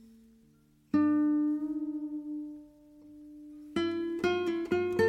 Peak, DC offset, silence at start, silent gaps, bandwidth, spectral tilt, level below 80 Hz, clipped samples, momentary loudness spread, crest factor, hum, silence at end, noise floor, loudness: -16 dBFS; under 0.1%; 0.95 s; none; 9.2 kHz; -6.5 dB/octave; -66 dBFS; under 0.1%; 22 LU; 16 dB; none; 0 s; -64 dBFS; -31 LUFS